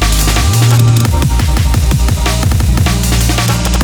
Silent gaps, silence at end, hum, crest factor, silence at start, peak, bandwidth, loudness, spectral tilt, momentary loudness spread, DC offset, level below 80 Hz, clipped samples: none; 0 s; none; 10 dB; 0 s; 0 dBFS; over 20 kHz; -11 LUFS; -4.5 dB/octave; 4 LU; under 0.1%; -14 dBFS; under 0.1%